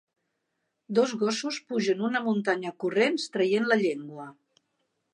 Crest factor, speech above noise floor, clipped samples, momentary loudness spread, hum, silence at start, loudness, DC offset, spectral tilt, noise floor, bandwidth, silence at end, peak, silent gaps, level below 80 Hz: 20 dB; 53 dB; under 0.1%; 9 LU; none; 0.9 s; -27 LUFS; under 0.1%; -4.5 dB/octave; -80 dBFS; 10.5 kHz; 0.8 s; -8 dBFS; none; -82 dBFS